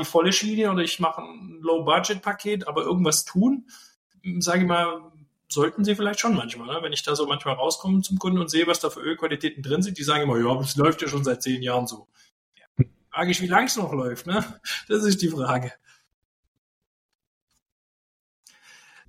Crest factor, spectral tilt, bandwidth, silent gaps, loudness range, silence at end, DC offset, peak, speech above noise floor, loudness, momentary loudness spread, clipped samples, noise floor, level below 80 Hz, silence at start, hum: 20 dB; -4.5 dB/octave; 16 kHz; 3.96-4.10 s, 12.32-12.52 s, 12.67-12.75 s; 4 LU; 3.35 s; under 0.1%; -4 dBFS; 29 dB; -24 LUFS; 9 LU; under 0.1%; -53 dBFS; -60 dBFS; 0 s; none